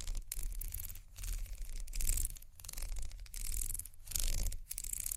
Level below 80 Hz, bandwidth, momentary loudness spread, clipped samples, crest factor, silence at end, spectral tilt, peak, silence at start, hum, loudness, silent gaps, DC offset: -40 dBFS; 16 kHz; 11 LU; under 0.1%; 26 dB; 0 s; -1.5 dB/octave; -12 dBFS; 0 s; none; -42 LUFS; none; under 0.1%